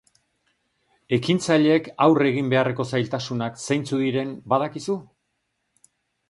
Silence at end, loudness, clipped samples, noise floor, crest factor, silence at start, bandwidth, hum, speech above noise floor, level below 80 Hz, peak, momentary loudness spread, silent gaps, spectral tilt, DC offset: 1.25 s; -22 LUFS; under 0.1%; -75 dBFS; 20 dB; 1.1 s; 11.5 kHz; none; 53 dB; -64 dBFS; -4 dBFS; 10 LU; none; -6 dB/octave; under 0.1%